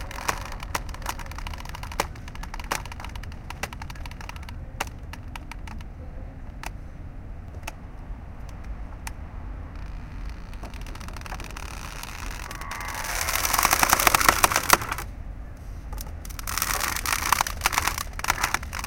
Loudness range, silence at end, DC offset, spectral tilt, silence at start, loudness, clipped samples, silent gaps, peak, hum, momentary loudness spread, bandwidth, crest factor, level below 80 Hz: 18 LU; 0 s; under 0.1%; -2 dB/octave; 0 s; -26 LUFS; under 0.1%; none; 0 dBFS; none; 20 LU; 17 kHz; 28 dB; -38 dBFS